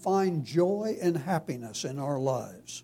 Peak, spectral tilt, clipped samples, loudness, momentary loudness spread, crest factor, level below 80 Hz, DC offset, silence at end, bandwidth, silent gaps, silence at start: -14 dBFS; -6 dB/octave; under 0.1%; -30 LUFS; 8 LU; 16 dB; -70 dBFS; under 0.1%; 0.05 s; 16.5 kHz; none; 0 s